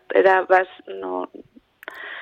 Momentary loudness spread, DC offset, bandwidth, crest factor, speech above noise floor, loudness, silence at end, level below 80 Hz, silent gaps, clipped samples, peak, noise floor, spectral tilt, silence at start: 21 LU; under 0.1%; 7 kHz; 18 dB; 24 dB; -20 LUFS; 0 s; -70 dBFS; none; under 0.1%; -4 dBFS; -43 dBFS; -5.5 dB/octave; 0.1 s